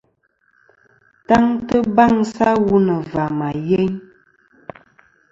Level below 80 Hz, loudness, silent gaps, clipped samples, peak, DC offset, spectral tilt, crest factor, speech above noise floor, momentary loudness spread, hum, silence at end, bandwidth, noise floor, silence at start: -48 dBFS; -17 LUFS; none; under 0.1%; 0 dBFS; under 0.1%; -7.5 dB/octave; 18 dB; 47 dB; 16 LU; none; 1.3 s; 7.8 kHz; -63 dBFS; 1.3 s